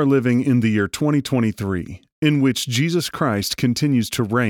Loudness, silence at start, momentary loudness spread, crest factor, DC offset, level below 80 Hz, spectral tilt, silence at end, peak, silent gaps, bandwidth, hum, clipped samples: -20 LUFS; 0 s; 5 LU; 14 dB; under 0.1%; -52 dBFS; -5.5 dB/octave; 0 s; -6 dBFS; 2.12-2.22 s; 18 kHz; none; under 0.1%